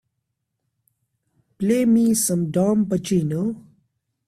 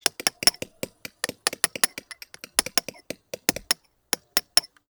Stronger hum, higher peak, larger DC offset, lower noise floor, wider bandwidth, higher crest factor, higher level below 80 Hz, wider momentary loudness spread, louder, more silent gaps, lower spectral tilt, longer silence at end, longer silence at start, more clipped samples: neither; second, -8 dBFS vs 0 dBFS; neither; first, -78 dBFS vs -44 dBFS; second, 15 kHz vs over 20 kHz; second, 14 dB vs 28 dB; about the same, -58 dBFS vs -62 dBFS; second, 10 LU vs 17 LU; first, -20 LUFS vs -24 LUFS; neither; first, -6 dB/octave vs 0 dB/octave; first, 0.7 s vs 0.25 s; first, 1.6 s vs 0.05 s; neither